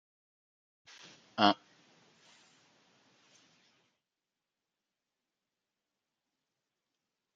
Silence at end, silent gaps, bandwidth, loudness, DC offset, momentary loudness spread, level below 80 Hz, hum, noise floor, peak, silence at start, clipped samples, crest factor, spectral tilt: 5.8 s; none; 7.8 kHz; -31 LUFS; under 0.1%; 26 LU; -90 dBFS; none; under -90 dBFS; -8 dBFS; 1.35 s; under 0.1%; 34 dB; -4.5 dB/octave